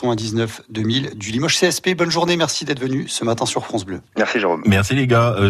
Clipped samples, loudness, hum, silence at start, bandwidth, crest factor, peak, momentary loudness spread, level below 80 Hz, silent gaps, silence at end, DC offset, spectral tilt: under 0.1%; -19 LUFS; none; 0 s; 13.5 kHz; 16 dB; -4 dBFS; 8 LU; -50 dBFS; none; 0 s; under 0.1%; -4.5 dB/octave